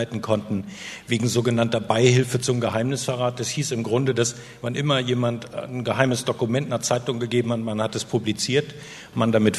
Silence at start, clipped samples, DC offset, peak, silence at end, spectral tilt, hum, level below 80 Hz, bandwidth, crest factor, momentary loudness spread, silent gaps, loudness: 0 s; under 0.1%; under 0.1%; 0 dBFS; 0 s; -5 dB/octave; none; -60 dBFS; 13.5 kHz; 22 dB; 9 LU; none; -23 LUFS